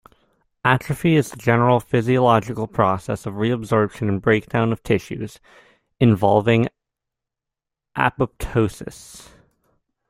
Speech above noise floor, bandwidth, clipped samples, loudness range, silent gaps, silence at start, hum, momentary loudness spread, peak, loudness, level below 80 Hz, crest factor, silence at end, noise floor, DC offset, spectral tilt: 66 dB; 15.5 kHz; under 0.1%; 4 LU; none; 0.65 s; none; 13 LU; -2 dBFS; -20 LUFS; -46 dBFS; 18 dB; 0.9 s; -85 dBFS; under 0.1%; -7 dB/octave